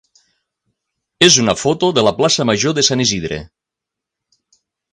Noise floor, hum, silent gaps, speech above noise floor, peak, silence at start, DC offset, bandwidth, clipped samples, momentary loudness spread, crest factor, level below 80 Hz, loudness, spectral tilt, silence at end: -83 dBFS; none; none; 69 dB; 0 dBFS; 1.2 s; under 0.1%; 11.5 kHz; under 0.1%; 10 LU; 18 dB; -48 dBFS; -13 LUFS; -3 dB/octave; 1.5 s